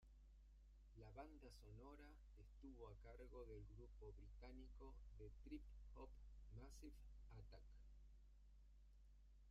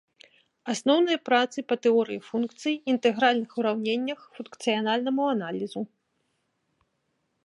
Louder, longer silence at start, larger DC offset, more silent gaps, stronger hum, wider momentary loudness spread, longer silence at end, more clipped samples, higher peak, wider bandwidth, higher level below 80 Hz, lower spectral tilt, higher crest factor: second, -64 LUFS vs -26 LUFS; second, 0 s vs 0.65 s; neither; neither; neither; second, 7 LU vs 11 LU; second, 0 s vs 1.6 s; neither; second, -44 dBFS vs -8 dBFS; second, 10 kHz vs 11.5 kHz; first, -64 dBFS vs -80 dBFS; first, -7 dB/octave vs -4 dB/octave; about the same, 18 dB vs 20 dB